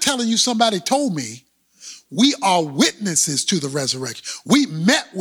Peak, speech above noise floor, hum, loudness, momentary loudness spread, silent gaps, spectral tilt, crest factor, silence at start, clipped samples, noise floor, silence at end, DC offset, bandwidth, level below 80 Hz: -2 dBFS; 23 dB; none; -18 LUFS; 12 LU; none; -3 dB/octave; 16 dB; 0 s; under 0.1%; -42 dBFS; 0 s; under 0.1%; over 20 kHz; -66 dBFS